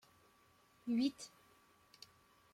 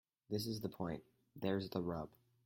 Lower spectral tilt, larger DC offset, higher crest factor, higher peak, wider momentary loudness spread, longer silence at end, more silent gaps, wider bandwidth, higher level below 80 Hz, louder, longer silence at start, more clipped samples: second, -4 dB/octave vs -6.5 dB/octave; neither; about the same, 20 dB vs 20 dB; about the same, -24 dBFS vs -24 dBFS; first, 22 LU vs 10 LU; first, 1.25 s vs 0.35 s; neither; about the same, 15.5 kHz vs 16.5 kHz; second, -84 dBFS vs -70 dBFS; first, -40 LUFS vs -43 LUFS; first, 0.85 s vs 0.3 s; neither